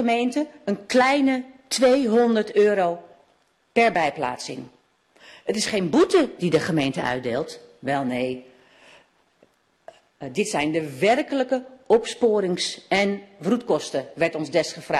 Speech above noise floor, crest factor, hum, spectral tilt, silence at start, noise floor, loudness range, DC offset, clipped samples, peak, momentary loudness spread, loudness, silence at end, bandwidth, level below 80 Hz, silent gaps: 42 dB; 18 dB; none; -4.5 dB/octave; 0 s; -64 dBFS; 8 LU; under 0.1%; under 0.1%; -6 dBFS; 11 LU; -22 LUFS; 0 s; 13 kHz; -62 dBFS; none